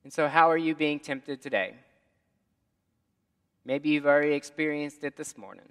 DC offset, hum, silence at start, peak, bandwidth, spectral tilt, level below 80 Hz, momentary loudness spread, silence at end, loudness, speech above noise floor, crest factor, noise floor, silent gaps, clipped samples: under 0.1%; none; 0.05 s; -4 dBFS; 12.5 kHz; -5 dB/octave; -82 dBFS; 16 LU; 0.2 s; -27 LUFS; 49 dB; 24 dB; -77 dBFS; none; under 0.1%